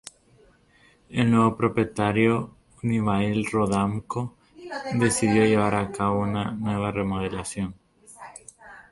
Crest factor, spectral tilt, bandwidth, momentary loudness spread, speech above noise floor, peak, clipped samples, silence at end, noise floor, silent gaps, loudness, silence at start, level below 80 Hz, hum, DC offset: 18 dB; -6 dB/octave; 11.5 kHz; 18 LU; 35 dB; -6 dBFS; under 0.1%; 0.1 s; -59 dBFS; none; -24 LUFS; 1.1 s; -50 dBFS; none; under 0.1%